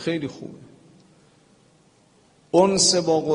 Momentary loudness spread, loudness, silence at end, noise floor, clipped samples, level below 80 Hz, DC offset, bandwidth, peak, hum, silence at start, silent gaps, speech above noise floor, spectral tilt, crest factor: 22 LU; -19 LUFS; 0 s; -58 dBFS; under 0.1%; -60 dBFS; under 0.1%; 11 kHz; -4 dBFS; 50 Hz at -65 dBFS; 0 s; none; 38 dB; -3.5 dB/octave; 20 dB